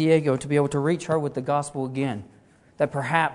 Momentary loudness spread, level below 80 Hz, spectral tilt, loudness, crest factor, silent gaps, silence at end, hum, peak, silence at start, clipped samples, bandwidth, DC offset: 7 LU; -60 dBFS; -6.5 dB/octave; -25 LUFS; 20 dB; none; 0 s; none; -4 dBFS; 0 s; under 0.1%; 11 kHz; under 0.1%